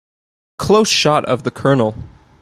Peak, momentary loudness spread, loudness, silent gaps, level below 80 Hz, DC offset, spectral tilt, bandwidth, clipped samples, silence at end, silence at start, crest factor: -2 dBFS; 11 LU; -15 LUFS; none; -46 dBFS; under 0.1%; -4.5 dB/octave; 15.5 kHz; under 0.1%; 0.35 s; 0.6 s; 16 dB